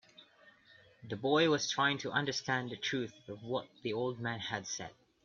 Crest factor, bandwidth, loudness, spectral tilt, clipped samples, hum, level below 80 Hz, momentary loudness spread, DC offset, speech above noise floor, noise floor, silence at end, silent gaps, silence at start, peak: 20 dB; 7.6 kHz; -35 LUFS; -4 dB/octave; under 0.1%; none; -74 dBFS; 13 LU; under 0.1%; 28 dB; -63 dBFS; 0.35 s; none; 0.2 s; -16 dBFS